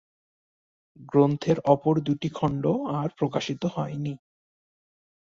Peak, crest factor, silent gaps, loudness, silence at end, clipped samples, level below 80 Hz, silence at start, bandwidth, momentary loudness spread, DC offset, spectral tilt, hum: -6 dBFS; 22 dB; none; -26 LUFS; 1.1 s; under 0.1%; -62 dBFS; 1 s; 7.6 kHz; 9 LU; under 0.1%; -7.5 dB/octave; none